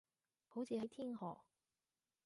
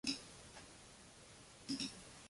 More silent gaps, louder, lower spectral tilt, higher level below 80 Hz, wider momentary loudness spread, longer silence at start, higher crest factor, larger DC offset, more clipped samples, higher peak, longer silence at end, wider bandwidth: neither; about the same, -48 LUFS vs -49 LUFS; first, -7 dB/octave vs -2.5 dB/octave; second, -88 dBFS vs -72 dBFS; second, 8 LU vs 15 LU; first, 0.5 s vs 0.05 s; second, 18 dB vs 26 dB; neither; neither; second, -32 dBFS vs -24 dBFS; first, 0.85 s vs 0 s; about the same, 11.5 kHz vs 11.5 kHz